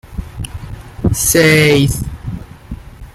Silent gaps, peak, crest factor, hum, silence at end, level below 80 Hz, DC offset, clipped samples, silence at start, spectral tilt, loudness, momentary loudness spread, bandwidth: none; 0 dBFS; 16 dB; none; 0.05 s; -30 dBFS; under 0.1%; under 0.1%; 0.05 s; -4 dB/octave; -12 LUFS; 23 LU; 16 kHz